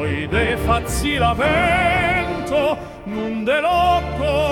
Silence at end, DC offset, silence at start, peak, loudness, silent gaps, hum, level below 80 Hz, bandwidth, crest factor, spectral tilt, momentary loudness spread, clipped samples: 0 s; under 0.1%; 0 s; -6 dBFS; -18 LUFS; none; none; -32 dBFS; 18 kHz; 14 dB; -5 dB/octave; 7 LU; under 0.1%